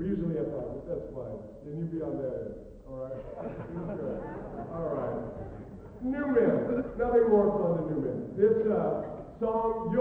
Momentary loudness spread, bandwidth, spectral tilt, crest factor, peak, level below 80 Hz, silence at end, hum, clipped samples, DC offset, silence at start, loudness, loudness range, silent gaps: 16 LU; 3.7 kHz; -10.5 dB/octave; 18 dB; -12 dBFS; -52 dBFS; 0 s; none; under 0.1%; under 0.1%; 0 s; -31 LUFS; 10 LU; none